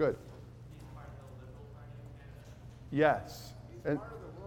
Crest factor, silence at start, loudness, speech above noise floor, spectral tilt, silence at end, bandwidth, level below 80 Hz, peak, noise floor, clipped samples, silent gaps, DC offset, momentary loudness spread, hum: 24 dB; 0 s; -34 LUFS; 19 dB; -7 dB/octave; 0 s; 17.5 kHz; -58 dBFS; -12 dBFS; -51 dBFS; under 0.1%; none; under 0.1%; 22 LU; none